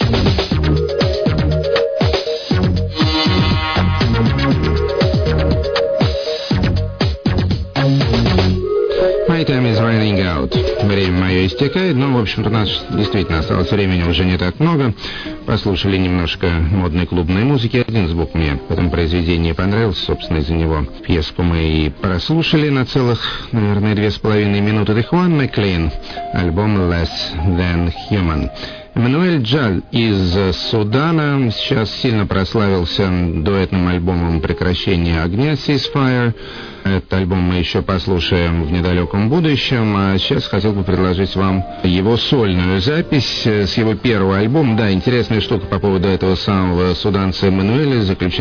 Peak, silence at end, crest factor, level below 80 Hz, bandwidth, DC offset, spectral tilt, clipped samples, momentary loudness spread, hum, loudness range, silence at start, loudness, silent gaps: -2 dBFS; 0 s; 14 dB; -28 dBFS; 5.4 kHz; under 0.1%; -7.5 dB/octave; under 0.1%; 4 LU; none; 2 LU; 0 s; -16 LUFS; none